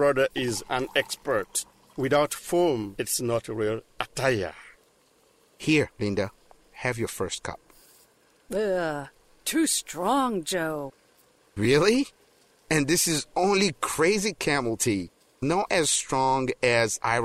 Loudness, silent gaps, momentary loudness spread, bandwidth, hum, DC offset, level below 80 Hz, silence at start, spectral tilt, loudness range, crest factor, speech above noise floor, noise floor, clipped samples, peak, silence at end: -26 LUFS; none; 11 LU; 16 kHz; none; under 0.1%; -54 dBFS; 0 s; -3.5 dB/octave; 6 LU; 20 dB; 37 dB; -63 dBFS; under 0.1%; -6 dBFS; 0 s